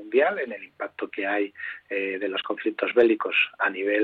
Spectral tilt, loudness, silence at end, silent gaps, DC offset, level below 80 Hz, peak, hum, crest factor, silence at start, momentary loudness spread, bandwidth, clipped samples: -6 dB/octave; -25 LUFS; 0 s; none; under 0.1%; -74 dBFS; -6 dBFS; none; 18 dB; 0 s; 13 LU; 4.7 kHz; under 0.1%